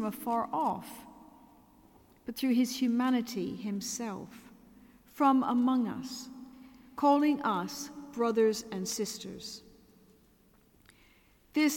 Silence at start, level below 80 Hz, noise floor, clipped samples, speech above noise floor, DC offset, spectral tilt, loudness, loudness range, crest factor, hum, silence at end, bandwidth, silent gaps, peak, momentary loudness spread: 0 s; -70 dBFS; -64 dBFS; under 0.1%; 34 dB; under 0.1%; -4.5 dB/octave; -31 LUFS; 5 LU; 18 dB; none; 0 s; 17.5 kHz; none; -14 dBFS; 20 LU